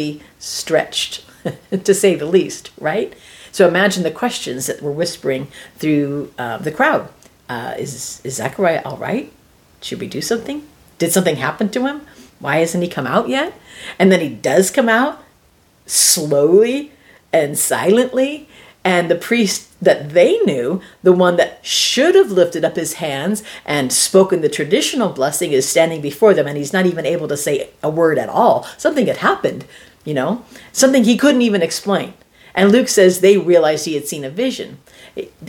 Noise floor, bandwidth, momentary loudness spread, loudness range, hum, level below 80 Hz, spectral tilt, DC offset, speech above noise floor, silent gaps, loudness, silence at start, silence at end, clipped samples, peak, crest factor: -53 dBFS; 19 kHz; 13 LU; 6 LU; none; -58 dBFS; -4 dB/octave; under 0.1%; 37 dB; none; -16 LUFS; 0 s; 0 s; under 0.1%; 0 dBFS; 16 dB